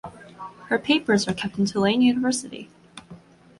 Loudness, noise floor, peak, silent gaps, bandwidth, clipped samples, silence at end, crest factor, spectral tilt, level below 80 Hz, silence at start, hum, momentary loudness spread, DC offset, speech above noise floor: -22 LUFS; -47 dBFS; -6 dBFS; none; 11.5 kHz; under 0.1%; 0.45 s; 18 dB; -4.5 dB/octave; -58 dBFS; 0.05 s; none; 23 LU; under 0.1%; 25 dB